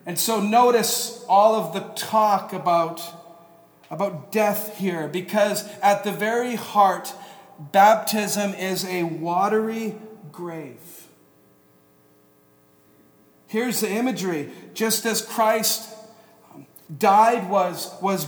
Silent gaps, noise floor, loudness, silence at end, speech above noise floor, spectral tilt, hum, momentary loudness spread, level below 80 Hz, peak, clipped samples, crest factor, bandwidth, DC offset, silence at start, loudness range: none; -57 dBFS; -21 LUFS; 0 s; 36 dB; -3.5 dB/octave; none; 18 LU; -78 dBFS; -4 dBFS; under 0.1%; 20 dB; over 20 kHz; under 0.1%; 0.05 s; 9 LU